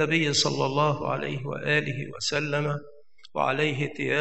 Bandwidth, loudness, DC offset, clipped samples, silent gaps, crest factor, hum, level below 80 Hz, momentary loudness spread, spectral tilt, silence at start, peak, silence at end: 8.6 kHz; -26 LUFS; 0.4%; under 0.1%; none; 18 dB; none; -66 dBFS; 9 LU; -4 dB/octave; 0 s; -8 dBFS; 0 s